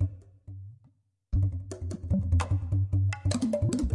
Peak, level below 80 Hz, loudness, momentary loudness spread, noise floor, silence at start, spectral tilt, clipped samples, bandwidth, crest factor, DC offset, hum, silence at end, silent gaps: -16 dBFS; -40 dBFS; -30 LUFS; 19 LU; -65 dBFS; 0 s; -7 dB/octave; under 0.1%; 11 kHz; 14 dB; under 0.1%; none; 0 s; none